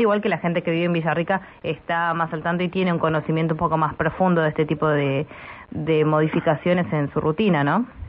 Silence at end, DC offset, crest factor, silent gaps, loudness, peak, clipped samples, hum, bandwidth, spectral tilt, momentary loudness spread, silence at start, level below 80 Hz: 0 s; under 0.1%; 14 dB; none; -22 LUFS; -6 dBFS; under 0.1%; none; 5.2 kHz; -11.5 dB/octave; 6 LU; 0 s; -50 dBFS